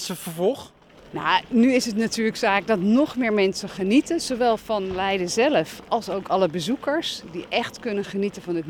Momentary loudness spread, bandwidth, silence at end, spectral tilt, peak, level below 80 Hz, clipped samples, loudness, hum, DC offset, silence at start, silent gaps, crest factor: 8 LU; 18.5 kHz; 0 s; -4.5 dB/octave; -6 dBFS; -56 dBFS; under 0.1%; -23 LUFS; none; under 0.1%; 0 s; none; 18 dB